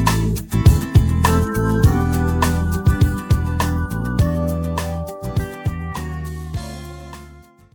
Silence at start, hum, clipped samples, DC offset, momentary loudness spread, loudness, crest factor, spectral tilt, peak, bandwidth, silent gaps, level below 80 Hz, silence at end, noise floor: 0 s; none; under 0.1%; under 0.1%; 13 LU; -19 LUFS; 18 dB; -6.5 dB/octave; 0 dBFS; 18 kHz; none; -24 dBFS; 0.35 s; -44 dBFS